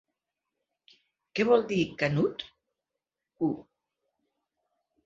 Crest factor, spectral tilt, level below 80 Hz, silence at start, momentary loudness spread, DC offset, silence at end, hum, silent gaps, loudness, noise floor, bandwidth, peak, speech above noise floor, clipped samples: 22 dB; -6.5 dB/octave; -66 dBFS; 1.35 s; 16 LU; under 0.1%; 1.45 s; 50 Hz at -60 dBFS; none; -28 LUFS; -88 dBFS; 7.8 kHz; -10 dBFS; 61 dB; under 0.1%